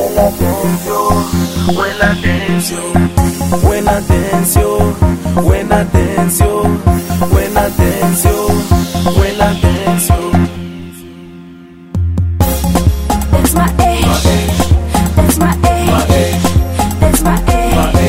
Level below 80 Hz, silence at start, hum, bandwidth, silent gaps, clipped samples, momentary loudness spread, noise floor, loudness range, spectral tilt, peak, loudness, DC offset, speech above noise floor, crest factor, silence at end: -18 dBFS; 0 s; none; 16.5 kHz; none; under 0.1%; 4 LU; -34 dBFS; 3 LU; -5.5 dB/octave; 0 dBFS; -12 LUFS; 3%; 22 dB; 12 dB; 0 s